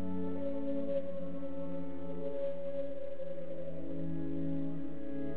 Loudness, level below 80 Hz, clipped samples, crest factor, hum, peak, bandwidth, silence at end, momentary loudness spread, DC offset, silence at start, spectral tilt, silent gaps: -40 LUFS; -62 dBFS; under 0.1%; 14 dB; none; -24 dBFS; 4 kHz; 0 s; 6 LU; 2%; 0 s; -9 dB/octave; none